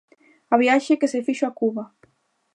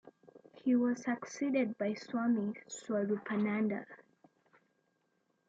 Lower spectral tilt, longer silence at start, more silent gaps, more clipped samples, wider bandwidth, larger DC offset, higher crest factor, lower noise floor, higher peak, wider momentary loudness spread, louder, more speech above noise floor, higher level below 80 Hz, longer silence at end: second, -4.5 dB/octave vs -6 dB/octave; first, 0.5 s vs 0.05 s; neither; neither; first, 11 kHz vs 7.8 kHz; neither; about the same, 20 dB vs 16 dB; second, -65 dBFS vs -78 dBFS; first, -4 dBFS vs -20 dBFS; about the same, 11 LU vs 9 LU; first, -21 LUFS vs -35 LUFS; about the same, 45 dB vs 44 dB; about the same, -80 dBFS vs -84 dBFS; second, 0.7 s vs 1.55 s